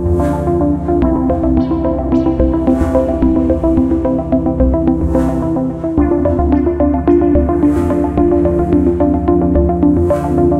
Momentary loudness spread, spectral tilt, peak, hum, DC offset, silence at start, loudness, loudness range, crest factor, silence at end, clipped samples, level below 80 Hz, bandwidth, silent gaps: 3 LU; -10 dB/octave; 0 dBFS; none; under 0.1%; 0 s; -13 LUFS; 1 LU; 12 dB; 0 s; under 0.1%; -22 dBFS; 10 kHz; none